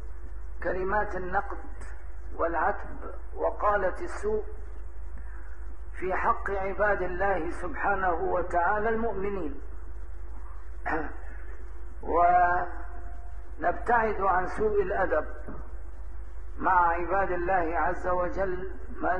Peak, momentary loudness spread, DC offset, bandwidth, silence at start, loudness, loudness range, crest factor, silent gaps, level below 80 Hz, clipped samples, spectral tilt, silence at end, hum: -10 dBFS; 19 LU; 2%; 10 kHz; 0 s; -28 LUFS; 5 LU; 20 dB; none; -40 dBFS; under 0.1%; -7.5 dB/octave; 0 s; none